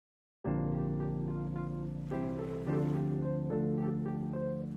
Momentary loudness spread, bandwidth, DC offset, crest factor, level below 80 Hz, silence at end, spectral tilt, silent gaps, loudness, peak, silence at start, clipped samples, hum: 5 LU; 4.3 kHz; under 0.1%; 12 dB; -52 dBFS; 0 s; -10.5 dB/octave; none; -35 LUFS; -22 dBFS; 0.45 s; under 0.1%; none